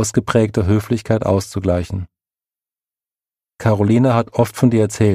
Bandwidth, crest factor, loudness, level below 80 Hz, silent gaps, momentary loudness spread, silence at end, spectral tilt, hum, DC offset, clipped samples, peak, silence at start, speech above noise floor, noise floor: 15.5 kHz; 16 dB; -17 LUFS; -42 dBFS; none; 7 LU; 0 s; -7 dB/octave; none; under 0.1%; under 0.1%; 0 dBFS; 0 s; over 74 dB; under -90 dBFS